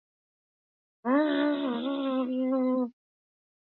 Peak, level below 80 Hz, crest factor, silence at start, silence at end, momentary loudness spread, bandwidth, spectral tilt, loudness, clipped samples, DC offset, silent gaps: -14 dBFS; -88 dBFS; 16 dB; 1.05 s; 0.85 s; 5 LU; 4.3 kHz; -8 dB/octave; -29 LUFS; under 0.1%; under 0.1%; none